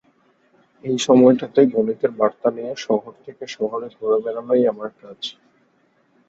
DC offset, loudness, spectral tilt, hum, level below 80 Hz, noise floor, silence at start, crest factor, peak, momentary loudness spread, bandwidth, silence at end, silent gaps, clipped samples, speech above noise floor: under 0.1%; -19 LUFS; -5.5 dB/octave; none; -64 dBFS; -62 dBFS; 0.85 s; 20 dB; -2 dBFS; 19 LU; 8 kHz; 1 s; none; under 0.1%; 42 dB